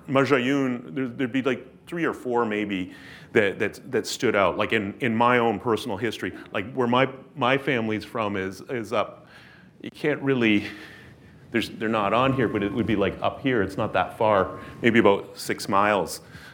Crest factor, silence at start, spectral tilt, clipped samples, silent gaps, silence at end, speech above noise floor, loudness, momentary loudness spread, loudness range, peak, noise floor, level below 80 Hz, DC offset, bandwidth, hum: 22 dB; 0.05 s; -5.5 dB/octave; under 0.1%; none; 0 s; 24 dB; -24 LUFS; 10 LU; 4 LU; -4 dBFS; -48 dBFS; -60 dBFS; under 0.1%; 19.5 kHz; none